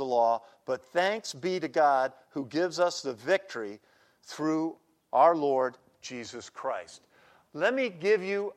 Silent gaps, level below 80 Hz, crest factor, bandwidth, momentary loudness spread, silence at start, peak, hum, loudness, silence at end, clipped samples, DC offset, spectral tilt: none; -82 dBFS; 20 dB; 14 kHz; 16 LU; 0 s; -10 dBFS; none; -29 LUFS; 0.05 s; under 0.1%; under 0.1%; -4.5 dB/octave